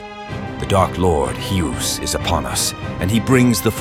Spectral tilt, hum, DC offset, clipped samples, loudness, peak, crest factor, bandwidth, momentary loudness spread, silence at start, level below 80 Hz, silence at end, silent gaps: -4.5 dB/octave; none; under 0.1%; under 0.1%; -18 LUFS; 0 dBFS; 18 dB; 17 kHz; 11 LU; 0 s; -36 dBFS; 0 s; none